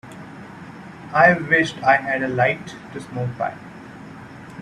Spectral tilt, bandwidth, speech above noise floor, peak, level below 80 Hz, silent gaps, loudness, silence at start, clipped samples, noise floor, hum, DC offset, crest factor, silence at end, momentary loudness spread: -6 dB/octave; 11.5 kHz; 19 dB; 0 dBFS; -58 dBFS; none; -19 LUFS; 0.05 s; under 0.1%; -39 dBFS; none; under 0.1%; 22 dB; 0 s; 24 LU